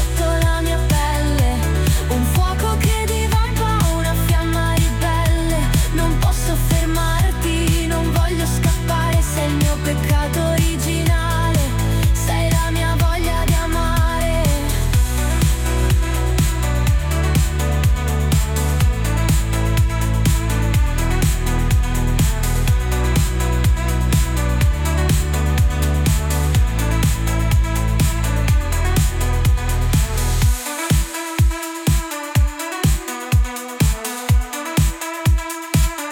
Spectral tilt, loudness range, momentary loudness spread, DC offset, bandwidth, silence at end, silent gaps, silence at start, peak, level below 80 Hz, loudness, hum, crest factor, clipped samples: -5 dB/octave; 2 LU; 2 LU; under 0.1%; 17.5 kHz; 0 s; none; 0 s; -6 dBFS; -20 dBFS; -18 LUFS; none; 10 dB; under 0.1%